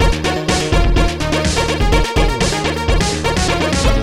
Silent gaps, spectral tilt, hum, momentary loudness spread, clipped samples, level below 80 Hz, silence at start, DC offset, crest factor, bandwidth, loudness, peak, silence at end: none; -4.5 dB/octave; none; 2 LU; under 0.1%; -18 dBFS; 0 s; 1%; 12 dB; 14 kHz; -16 LUFS; -2 dBFS; 0 s